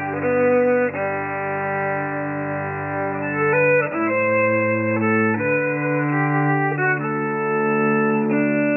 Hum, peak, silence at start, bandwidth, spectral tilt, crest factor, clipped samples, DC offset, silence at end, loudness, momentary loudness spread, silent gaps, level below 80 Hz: none; -8 dBFS; 0 s; 3.1 kHz; -8 dB/octave; 12 dB; under 0.1%; under 0.1%; 0 s; -20 LUFS; 7 LU; none; -66 dBFS